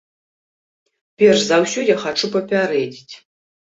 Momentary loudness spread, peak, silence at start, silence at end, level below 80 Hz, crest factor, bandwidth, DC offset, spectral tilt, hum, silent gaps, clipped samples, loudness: 9 LU; -2 dBFS; 1.2 s; 0.55 s; -64 dBFS; 18 dB; 8 kHz; under 0.1%; -4 dB/octave; none; none; under 0.1%; -17 LUFS